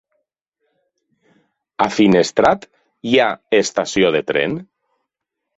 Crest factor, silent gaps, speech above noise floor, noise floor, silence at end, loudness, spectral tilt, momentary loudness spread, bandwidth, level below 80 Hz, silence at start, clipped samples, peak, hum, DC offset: 18 dB; none; 64 dB; -80 dBFS; 0.95 s; -16 LUFS; -4.5 dB/octave; 11 LU; 8.2 kHz; -54 dBFS; 1.8 s; under 0.1%; -2 dBFS; none; under 0.1%